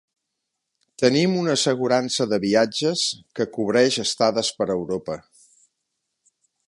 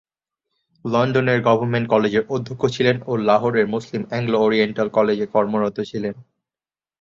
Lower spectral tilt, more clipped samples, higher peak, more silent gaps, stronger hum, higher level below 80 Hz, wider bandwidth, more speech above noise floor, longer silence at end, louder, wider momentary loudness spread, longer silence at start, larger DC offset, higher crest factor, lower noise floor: second, -4 dB/octave vs -7 dB/octave; neither; about the same, -4 dBFS vs -2 dBFS; neither; neither; about the same, -62 dBFS vs -58 dBFS; first, 11.5 kHz vs 7.6 kHz; second, 59 dB vs over 71 dB; first, 1.5 s vs 0.8 s; about the same, -21 LUFS vs -20 LUFS; about the same, 9 LU vs 9 LU; first, 1 s vs 0.85 s; neither; about the same, 20 dB vs 18 dB; second, -80 dBFS vs under -90 dBFS